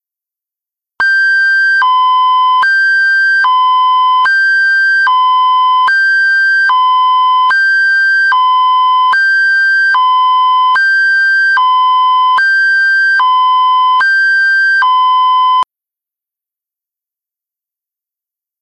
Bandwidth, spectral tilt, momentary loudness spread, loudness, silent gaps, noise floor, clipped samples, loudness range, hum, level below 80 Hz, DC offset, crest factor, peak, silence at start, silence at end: 8.4 kHz; 2.5 dB/octave; 1 LU; -8 LUFS; none; -86 dBFS; under 0.1%; 3 LU; none; -68 dBFS; under 0.1%; 6 dB; -4 dBFS; 1 s; 3 s